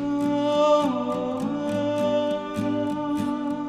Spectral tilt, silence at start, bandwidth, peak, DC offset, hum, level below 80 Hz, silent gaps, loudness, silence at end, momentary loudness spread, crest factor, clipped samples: -6.5 dB/octave; 0 s; 13 kHz; -10 dBFS; under 0.1%; none; -58 dBFS; none; -24 LUFS; 0 s; 7 LU; 14 dB; under 0.1%